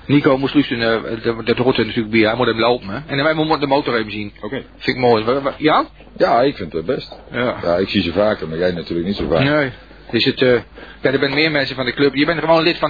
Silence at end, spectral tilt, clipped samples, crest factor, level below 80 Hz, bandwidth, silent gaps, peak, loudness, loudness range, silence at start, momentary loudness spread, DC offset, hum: 0 s; -7.5 dB/octave; under 0.1%; 16 dB; -44 dBFS; 5 kHz; none; -2 dBFS; -17 LUFS; 2 LU; 0.05 s; 8 LU; 0.2%; none